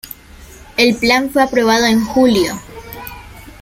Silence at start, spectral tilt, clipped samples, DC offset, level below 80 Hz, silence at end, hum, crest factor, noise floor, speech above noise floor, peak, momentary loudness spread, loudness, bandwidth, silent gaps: 0.05 s; -4 dB/octave; under 0.1%; under 0.1%; -40 dBFS; 0.1 s; none; 16 dB; -38 dBFS; 25 dB; 0 dBFS; 20 LU; -13 LUFS; 16.5 kHz; none